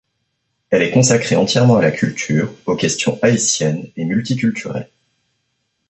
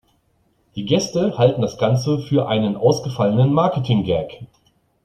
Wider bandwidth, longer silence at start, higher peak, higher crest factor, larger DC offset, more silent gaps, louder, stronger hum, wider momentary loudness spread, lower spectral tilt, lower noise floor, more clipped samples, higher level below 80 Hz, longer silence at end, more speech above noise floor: about the same, 8.4 kHz vs 9.2 kHz; about the same, 0.7 s vs 0.75 s; about the same, 0 dBFS vs -2 dBFS; about the same, 16 dB vs 18 dB; neither; neither; first, -16 LUFS vs -19 LUFS; neither; about the same, 8 LU vs 6 LU; second, -4.5 dB/octave vs -7 dB/octave; first, -70 dBFS vs -63 dBFS; neither; about the same, -54 dBFS vs -52 dBFS; first, 1.05 s vs 0.6 s; first, 54 dB vs 45 dB